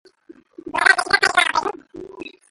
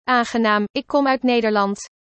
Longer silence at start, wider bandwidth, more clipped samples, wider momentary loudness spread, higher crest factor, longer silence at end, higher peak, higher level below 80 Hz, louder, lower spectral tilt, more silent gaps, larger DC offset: first, 0.65 s vs 0.05 s; first, 12 kHz vs 8.6 kHz; neither; first, 23 LU vs 5 LU; first, 22 dB vs 14 dB; about the same, 0.25 s vs 0.3 s; first, 0 dBFS vs -4 dBFS; about the same, -58 dBFS vs -60 dBFS; about the same, -17 LUFS vs -19 LUFS; second, -0.5 dB/octave vs -4.5 dB/octave; second, none vs 0.70-0.74 s; neither